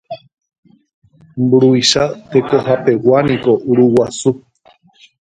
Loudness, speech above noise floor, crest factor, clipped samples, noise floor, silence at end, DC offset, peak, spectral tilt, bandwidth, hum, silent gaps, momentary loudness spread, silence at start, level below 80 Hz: -13 LUFS; 38 dB; 14 dB; under 0.1%; -50 dBFS; 0.85 s; under 0.1%; 0 dBFS; -5 dB/octave; 9.4 kHz; none; 0.58-0.63 s, 0.94-1.02 s; 13 LU; 0.1 s; -52 dBFS